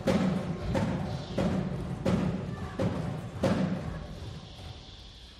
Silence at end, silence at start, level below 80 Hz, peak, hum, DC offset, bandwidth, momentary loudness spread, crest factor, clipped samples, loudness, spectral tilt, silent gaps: 0 s; 0 s; -46 dBFS; -14 dBFS; none; under 0.1%; 12.5 kHz; 16 LU; 18 dB; under 0.1%; -32 LUFS; -7 dB/octave; none